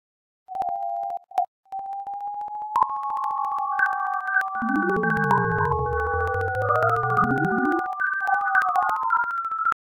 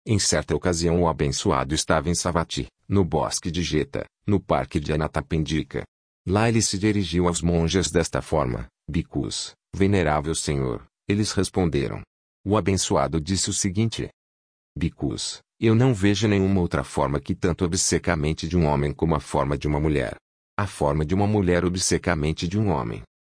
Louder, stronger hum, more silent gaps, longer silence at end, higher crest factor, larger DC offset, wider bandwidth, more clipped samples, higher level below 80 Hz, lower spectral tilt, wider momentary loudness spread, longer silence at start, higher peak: about the same, -24 LUFS vs -24 LUFS; neither; second, 1.48-1.63 s vs 5.88-6.25 s, 12.07-12.44 s, 14.14-14.75 s, 20.21-20.57 s; about the same, 0.25 s vs 0.25 s; about the same, 18 dB vs 18 dB; neither; first, 17 kHz vs 10.5 kHz; neither; second, -46 dBFS vs -38 dBFS; first, -7.5 dB/octave vs -5 dB/octave; about the same, 11 LU vs 9 LU; first, 0.5 s vs 0.05 s; about the same, -6 dBFS vs -6 dBFS